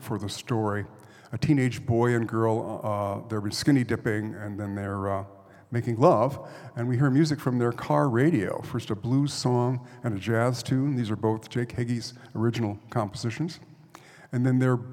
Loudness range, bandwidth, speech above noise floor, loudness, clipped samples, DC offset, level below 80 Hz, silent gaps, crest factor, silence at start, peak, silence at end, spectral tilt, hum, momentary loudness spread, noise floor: 4 LU; 15.5 kHz; 25 dB; -27 LUFS; under 0.1%; under 0.1%; -62 dBFS; none; 22 dB; 0 s; -6 dBFS; 0 s; -7 dB/octave; none; 11 LU; -51 dBFS